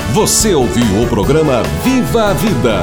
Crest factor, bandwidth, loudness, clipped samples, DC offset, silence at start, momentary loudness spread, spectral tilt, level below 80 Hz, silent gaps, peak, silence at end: 10 dB; over 20 kHz; -12 LUFS; under 0.1%; under 0.1%; 0 s; 4 LU; -4.5 dB/octave; -26 dBFS; none; 0 dBFS; 0 s